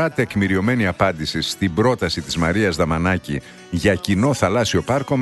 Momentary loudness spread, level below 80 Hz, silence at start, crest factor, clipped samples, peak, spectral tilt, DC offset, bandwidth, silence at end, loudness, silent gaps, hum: 5 LU; -40 dBFS; 0 s; 16 dB; under 0.1%; -4 dBFS; -5.5 dB/octave; under 0.1%; 12.5 kHz; 0 s; -19 LUFS; none; none